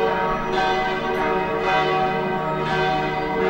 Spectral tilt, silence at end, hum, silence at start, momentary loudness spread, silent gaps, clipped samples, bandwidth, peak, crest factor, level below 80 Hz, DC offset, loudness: -6 dB/octave; 0 s; none; 0 s; 3 LU; none; under 0.1%; 16 kHz; -8 dBFS; 14 dB; -42 dBFS; under 0.1%; -21 LUFS